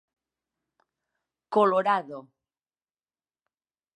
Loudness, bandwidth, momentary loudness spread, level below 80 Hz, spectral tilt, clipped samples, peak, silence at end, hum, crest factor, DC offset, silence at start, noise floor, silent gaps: -24 LUFS; 10.5 kHz; 20 LU; -88 dBFS; -6.5 dB/octave; under 0.1%; -8 dBFS; 1.75 s; none; 22 dB; under 0.1%; 1.5 s; under -90 dBFS; none